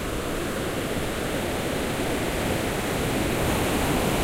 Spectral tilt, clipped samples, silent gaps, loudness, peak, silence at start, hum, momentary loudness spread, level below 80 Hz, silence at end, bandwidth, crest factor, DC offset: -4.5 dB/octave; under 0.1%; none; -26 LUFS; -12 dBFS; 0 s; none; 4 LU; -36 dBFS; 0 s; 16 kHz; 14 dB; under 0.1%